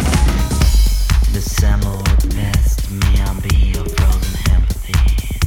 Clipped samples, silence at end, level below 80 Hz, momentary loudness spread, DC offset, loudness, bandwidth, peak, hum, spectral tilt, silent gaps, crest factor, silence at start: under 0.1%; 0 s; -14 dBFS; 3 LU; under 0.1%; -17 LUFS; 17 kHz; -2 dBFS; none; -5 dB/octave; none; 12 dB; 0 s